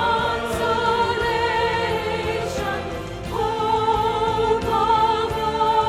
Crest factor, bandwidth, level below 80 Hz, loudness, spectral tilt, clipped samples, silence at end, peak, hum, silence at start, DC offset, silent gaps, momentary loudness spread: 14 dB; 15 kHz; -40 dBFS; -21 LUFS; -5 dB/octave; under 0.1%; 0 s; -8 dBFS; none; 0 s; under 0.1%; none; 6 LU